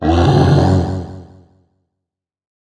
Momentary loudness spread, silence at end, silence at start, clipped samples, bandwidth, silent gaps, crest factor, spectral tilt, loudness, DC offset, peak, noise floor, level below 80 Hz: 15 LU; 1.5 s; 0 s; under 0.1%; 9.8 kHz; none; 16 dB; -8 dB/octave; -13 LUFS; under 0.1%; 0 dBFS; -81 dBFS; -32 dBFS